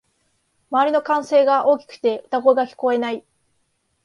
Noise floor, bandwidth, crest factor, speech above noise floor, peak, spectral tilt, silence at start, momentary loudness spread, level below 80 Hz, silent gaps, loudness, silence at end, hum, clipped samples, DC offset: -68 dBFS; 11 kHz; 18 dB; 50 dB; -2 dBFS; -4.5 dB/octave; 0.7 s; 7 LU; -72 dBFS; none; -19 LUFS; 0.85 s; none; under 0.1%; under 0.1%